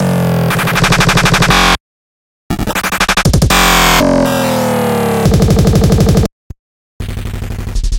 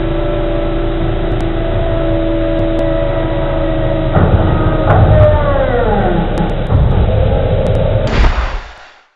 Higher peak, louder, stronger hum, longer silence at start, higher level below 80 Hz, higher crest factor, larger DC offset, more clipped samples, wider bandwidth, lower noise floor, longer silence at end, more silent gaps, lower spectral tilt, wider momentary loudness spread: about the same, 0 dBFS vs 0 dBFS; first, -10 LUFS vs -14 LUFS; neither; about the same, 0 s vs 0 s; about the same, -20 dBFS vs -16 dBFS; about the same, 12 dB vs 12 dB; neither; second, under 0.1% vs 0.1%; first, 17.5 kHz vs 6.2 kHz; first, under -90 dBFS vs -36 dBFS; second, 0 s vs 0.3 s; first, 1.80-2.50 s, 6.32-6.50 s, 6.59-7.00 s vs none; second, -4.5 dB/octave vs -9 dB/octave; first, 14 LU vs 7 LU